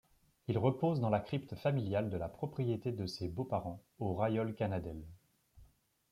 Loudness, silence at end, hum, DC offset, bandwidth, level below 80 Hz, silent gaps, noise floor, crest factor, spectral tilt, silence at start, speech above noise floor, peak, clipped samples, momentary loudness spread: -37 LUFS; 0.45 s; none; under 0.1%; 14.5 kHz; -62 dBFS; none; -66 dBFS; 18 dB; -8.5 dB/octave; 0.5 s; 30 dB; -18 dBFS; under 0.1%; 9 LU